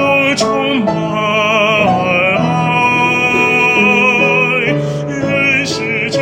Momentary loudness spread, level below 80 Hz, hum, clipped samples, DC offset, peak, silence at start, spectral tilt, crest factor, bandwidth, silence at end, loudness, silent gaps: 7 LU; -46 dBFS; none; under 0.1%; under 0.1%; 0 dBFS; 0 s; -5 dB/octave; 12 dB; 16.5 kHz; 0 s; -11 LUFS; none